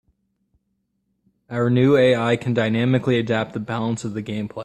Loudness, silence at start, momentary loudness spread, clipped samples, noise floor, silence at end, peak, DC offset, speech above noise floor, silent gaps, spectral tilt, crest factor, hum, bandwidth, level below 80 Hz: -20 LUFS; 1.5 s; 12 LU; under 0.1%; -72 dBFS; 0 s; -6 dBFS; under 0.1%; 53 dB; none; -7 dB/octave; 16 dB; none; 10 kHz; -58 dBFS